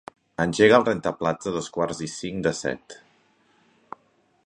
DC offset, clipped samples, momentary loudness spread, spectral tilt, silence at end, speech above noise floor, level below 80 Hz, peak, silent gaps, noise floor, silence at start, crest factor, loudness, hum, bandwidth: under 0.1%; under 0.1%; 27 LU; -5 dB/octave; 1.5 s; 41 dB; -56 dBFS; -2 dBFS; none; -64 dBFS; 0.4 s; 24 dB; -23 LUFS; none; 10.5 kHz